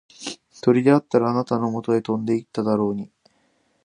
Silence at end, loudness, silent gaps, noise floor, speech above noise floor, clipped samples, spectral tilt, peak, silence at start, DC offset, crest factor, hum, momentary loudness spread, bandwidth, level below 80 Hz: 0.8 s; -21 LUFS; none; -65 dBFS; 45 dB; under 0.1%; -7 dB/octave; -2 dBFS; 0.2 s; under 0.1%; 20 dB; none; 17 LU; 11 kHz; -64 dBFS